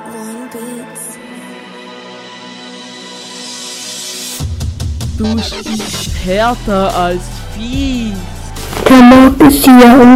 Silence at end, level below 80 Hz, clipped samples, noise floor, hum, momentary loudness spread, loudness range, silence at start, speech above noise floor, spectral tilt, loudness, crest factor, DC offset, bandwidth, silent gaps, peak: 0 s; -26 dBFS; 3%; -30 dBFS; none; 26 LU; 18 LU; 0 s; 23 dB; -5 dB/octave; -10 LUFS; 10 dB; under 0.1%; 16 kHz; none; 0 dBFS